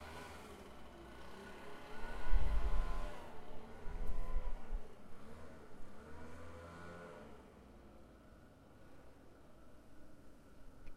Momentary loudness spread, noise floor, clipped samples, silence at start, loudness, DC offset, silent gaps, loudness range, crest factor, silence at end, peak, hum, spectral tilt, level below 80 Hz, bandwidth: 20 LU; -61 dBFS; under 0.1%; 0 s; -50 LUFS; under 0.1%; none; 15 LU; 20 dB; 0 s; -18 dBFS; none; -6 dB/octave; -44 dBFS; 8.6 kHz